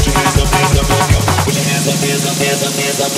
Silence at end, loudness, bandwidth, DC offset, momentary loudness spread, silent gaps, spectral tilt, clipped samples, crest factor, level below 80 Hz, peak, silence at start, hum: 0 s; -13 LUFS; 16.5 kHz; under 0.1%; 2 LU; none; -4 dB/octave; under 0.1%; 12 dB; -22 dBFS; 0 dBFS; 0 s; none